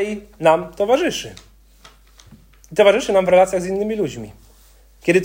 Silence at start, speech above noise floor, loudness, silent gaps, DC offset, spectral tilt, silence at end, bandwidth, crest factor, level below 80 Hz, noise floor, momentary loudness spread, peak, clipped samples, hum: 0 s; 32 dB; -18 LUFS; none; under 0.1%; -4.5 dB/octave; 0 s; 16.5 kHz; 18 dB; -48 dBFS; -49 dBFS; 13 LU; 0 dBFS; under 0.1%; none